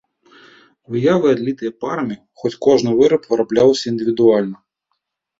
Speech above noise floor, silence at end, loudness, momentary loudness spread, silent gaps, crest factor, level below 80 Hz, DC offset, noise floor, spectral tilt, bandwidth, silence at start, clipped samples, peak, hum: 58 dB; 0.85 s; -17 LUFS; 11 LU; none; 16 dB; -58 dBFS; under 0.1%; -73 dBFS; -6 dB/octave; 7.8 kHz; 0.9 s; under 0.1%; -2 dBFS; none